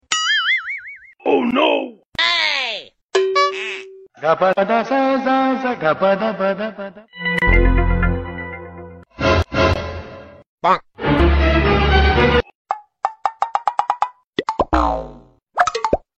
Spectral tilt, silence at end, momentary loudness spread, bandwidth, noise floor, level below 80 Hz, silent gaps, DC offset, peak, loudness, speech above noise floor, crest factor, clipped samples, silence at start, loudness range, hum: -5 dB/octave; 0.2 s; 14 LU; 8.4 kHz; -42 dBFS; -26 dBFS; 2.06-2.10 s, 3.03-3.09 s, 10.46-10.58 s, 12.55-12.65 s, 14.26-14.33 s; under 0.1%; -2 dBFS; -18 LUFS; 25 dB; 16 dB; under 0.1%; 0.1 s; 4 LU; none